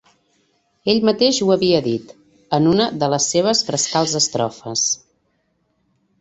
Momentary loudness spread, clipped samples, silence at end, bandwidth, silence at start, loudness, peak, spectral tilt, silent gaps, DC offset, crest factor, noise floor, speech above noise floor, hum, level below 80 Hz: 8 LU; under 0.1%; 1.25 s; 8.4 kHz; 0.85 s; -18 LUFS; -2 dBFS; -3.5 dB/octave; none; under 0.1%; 18 dB; -66 dBFS; 49 dB; none; -56 dBFS